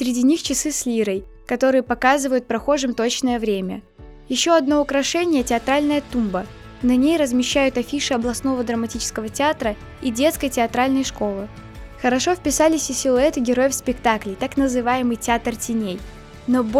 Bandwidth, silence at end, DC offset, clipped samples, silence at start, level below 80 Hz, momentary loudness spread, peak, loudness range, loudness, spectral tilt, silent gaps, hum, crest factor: 16 kHz; 0 s; under 0.1%; under 0.1%; 0 s; -42 dBFS; 9 LU; -4 dBFS; 2 LU; -20 LUFS; -3.5 dB/octave; none; none; 18 dB